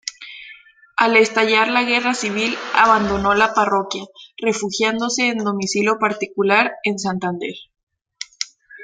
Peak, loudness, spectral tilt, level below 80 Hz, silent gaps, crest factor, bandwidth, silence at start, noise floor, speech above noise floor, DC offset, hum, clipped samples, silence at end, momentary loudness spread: -2 dBFS; -18 LUFS; -3.5 dB/octave; -50 dBFS; 7.83-7.87 s; 18 dB; 9.4 kHz; 0.05 s; -45 dBFS; 27 dB; under 0.1%; none; under 0.1%; 0 s; 16 LU